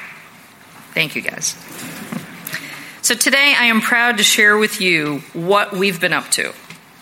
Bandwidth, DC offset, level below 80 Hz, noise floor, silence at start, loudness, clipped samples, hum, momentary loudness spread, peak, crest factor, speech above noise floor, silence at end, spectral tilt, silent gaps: 17 kHz; under 0.1%; -68 dBFS; -43 dBFS; 0 s; -15 LUFS; under 0.1%; none; 18 LU; 0 dBFS; 18 dB; 27 dB; 0.25 s; -2 dB/octave; none